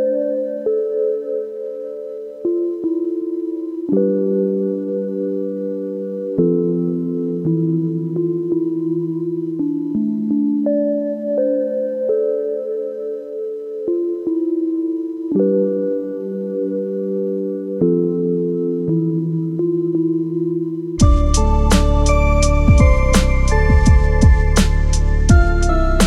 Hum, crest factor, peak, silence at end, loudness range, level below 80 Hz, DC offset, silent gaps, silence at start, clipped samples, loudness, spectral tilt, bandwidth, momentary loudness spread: none; 16 dB; 0 dBFS; 0 s; 7 LU; -20 dBFS; under 0.1%; none; 0 s; under 0.1%; -19 LUFS; -7 dB/octave; 12.5 kHz; 10 LU